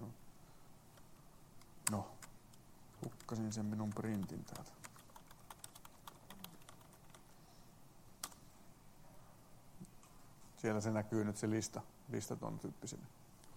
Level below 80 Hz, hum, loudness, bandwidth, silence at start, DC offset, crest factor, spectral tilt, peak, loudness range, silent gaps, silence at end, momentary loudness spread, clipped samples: -68 dBFS; none; -44 LUFS; 16.5 kHz; 0 s; under 0.1%; 32 dB; -5 dB/octave; -14 dBFS; 15 LU; none; 0 s; 24 LU; under 0.1%